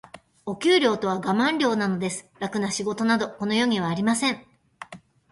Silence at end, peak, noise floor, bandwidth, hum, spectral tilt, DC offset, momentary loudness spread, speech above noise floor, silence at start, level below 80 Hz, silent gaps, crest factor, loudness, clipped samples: 0.35 s; -8 dBFS; -44 dBFS; 11.5 kHz; none; -4.5 dB/octave; under 0.1%; 17 LU; 21 dB; 0.15 s; -64 dBFS; none; 18 dB; -24 LUFS; under 0.1%